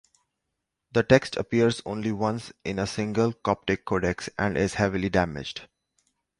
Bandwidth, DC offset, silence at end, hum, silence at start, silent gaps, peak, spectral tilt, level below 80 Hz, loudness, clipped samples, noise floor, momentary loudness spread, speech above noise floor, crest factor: 11.5 kHz; under 0.1%; 0.75 s; none; 0.95 s; none; -4 dBFS; -6 dB/octave; -48 dBFS; -26 LUFS; under 0.1%; -82 dBFS; 9 LU; 57 dB; 22 dB